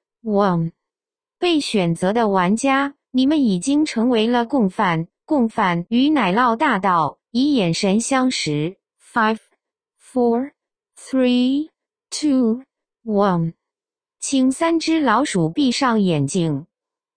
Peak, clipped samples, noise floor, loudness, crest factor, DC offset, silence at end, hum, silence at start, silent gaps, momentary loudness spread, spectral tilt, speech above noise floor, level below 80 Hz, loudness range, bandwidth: -4 dBFS; under 0.1%; under -90 dBFS; -19 LUFS; 16 dB; under 0.1%; 0.55 s; none; 0.25 s; none; 8 LU; -5 dB/octave; over 72 dB; -56 dBFS; 4 LU; 10 kHz